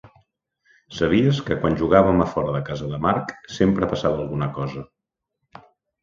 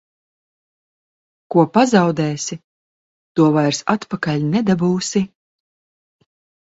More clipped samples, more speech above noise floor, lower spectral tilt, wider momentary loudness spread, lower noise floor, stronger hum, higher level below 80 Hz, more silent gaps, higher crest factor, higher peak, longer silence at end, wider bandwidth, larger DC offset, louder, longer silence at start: neither; second, 62 dB vs over 74 dB; first, -7.5 dB/octave vs -5.5 dB/octave; about the same, 13 LU vs 11 LU; second, -82 dBFS vs under -90 dBFS; neither; first, -44 dBFS vs -58 dBFS; second, none vs 2.64-3.35 s; about the same, 22 dB vs 20 dB; about the same, 0 dBFS vs 0 dBFS; second, 1.15 s vs 1.4 s; about the same, 7.6 kHz vs 8 kHz; neither; second, -21 LUFS vs -18 LUFS; second, 0.05 s vs 1.5 s